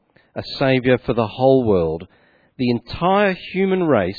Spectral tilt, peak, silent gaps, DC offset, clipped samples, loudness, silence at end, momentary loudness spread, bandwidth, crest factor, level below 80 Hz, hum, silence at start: -9 dB/octave; -2 dBFS; none; under 0.1%; under 0.1%; -18 LUFS; 0 s; 11 LU; 4.9 kHz; 16 dB; -46 dBFS; none; 0.35 s